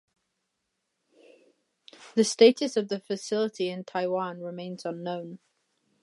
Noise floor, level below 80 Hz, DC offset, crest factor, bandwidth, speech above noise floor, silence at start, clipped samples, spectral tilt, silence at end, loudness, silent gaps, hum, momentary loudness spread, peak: -80 dBFS; -84 dBFS; under 0.1%; 24 dB; 11.5 kHz; 54 dB; 2 s; under 0.1%; -4.5 dB/octave; 0.65 s; -27 LUFS; none; none; 17 LU; -4 dBFS